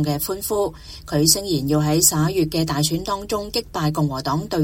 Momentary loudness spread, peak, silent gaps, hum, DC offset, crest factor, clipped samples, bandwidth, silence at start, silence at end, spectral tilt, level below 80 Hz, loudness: 9 LU; -2 dBFS; none; none; under 0.1%; 20 dB; under 0.1%; 17 kHz; 0 s; 0 s; -4 dB/octave; -42 dBFS; -20 LUFS